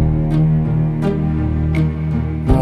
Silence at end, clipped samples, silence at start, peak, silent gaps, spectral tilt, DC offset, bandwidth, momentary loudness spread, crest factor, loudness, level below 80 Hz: 0 s; under 0.1%; 0 s; 0 dBFS; none; -10 dB/octave; under 0.1%; 4.8 kHz; 4 LU; 16 dB; -17 LUFS; -24 dBFS